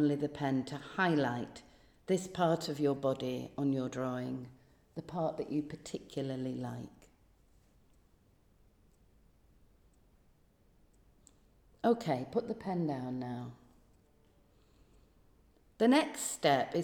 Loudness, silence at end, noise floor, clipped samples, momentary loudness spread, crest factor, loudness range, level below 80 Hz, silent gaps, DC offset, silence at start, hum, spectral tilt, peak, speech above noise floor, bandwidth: -35 LUFS; 0 s; -67 dBFS; under 0.1%; 15 LU; 20 dB; 10 LU; -68 dBFS; none; under 0.1%; 0 s; none; -5.5 dB/octave; -16 dBFS; 34 dB; over 20 kHz